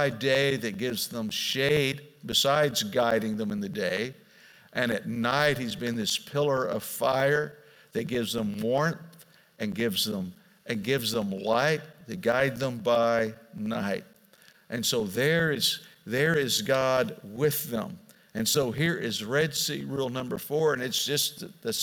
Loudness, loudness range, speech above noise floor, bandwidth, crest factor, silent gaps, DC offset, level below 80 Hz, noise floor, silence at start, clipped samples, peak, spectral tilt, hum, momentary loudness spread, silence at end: -27 LUFS; 3 LU; 31 dB; 18.5 kHz; 20 dB; none; under 0.1%; -62 dBFS; -58 dBFS; 0 s; under 0.1%; -8 dBFS; -4 dB/octave; none; 10 LU; 0 s